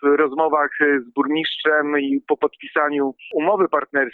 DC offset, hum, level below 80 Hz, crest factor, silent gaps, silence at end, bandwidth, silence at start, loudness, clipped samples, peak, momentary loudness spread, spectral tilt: under 0.1%; none; -76 dBFS; 14 dB; none; 0.05 s; 4.4 kHz; 0 s; -20 LUFS; under 0.1%; -4 dBFS; 4 LU; -7.5 dB/octave